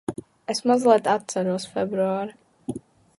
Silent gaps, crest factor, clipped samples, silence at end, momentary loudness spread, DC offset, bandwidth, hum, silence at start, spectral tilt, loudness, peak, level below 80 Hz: none; 20 dB; under 0.1%; 0.4 s; 18 LU; under 0.1%; 11.5 kHz; none; 0.1 s; -5 dB/octave; -23 LUFS; -4 dBFS; -64 dBFS